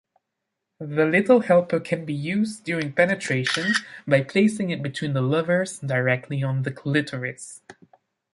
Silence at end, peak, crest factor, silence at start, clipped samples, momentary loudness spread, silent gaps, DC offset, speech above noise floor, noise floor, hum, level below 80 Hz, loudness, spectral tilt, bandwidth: 0.6 s; -4 dBFS; 20 dB; 0.8 s; under 0.1%; 9 LU; none; under 0.1%; 59 dB; -81 dBFS; none; -66 dBFS; -23 LUFS; -6 dB/octave; 11.5 kHz